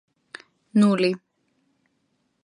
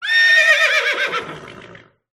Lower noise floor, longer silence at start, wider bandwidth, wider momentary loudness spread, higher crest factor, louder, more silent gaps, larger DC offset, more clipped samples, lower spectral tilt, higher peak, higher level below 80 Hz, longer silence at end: first, -71 dBFS vs -43 dBFS; first, 0.75 s vs 0 s; second, 11 kHz vs 13 kHz; first, 25 LU vs 20 LU; about the same, 18 dB vs 14 dB; second, -22 LUFS vs -13 LUFS; neither; neither; neither; first, -7 dB/octave vs 0 dB/octave; second, -8 dBFS vs -4 dBFS; second, -76 dBFS vs -64 dBFS; first, 1.25 s vs 0.4 s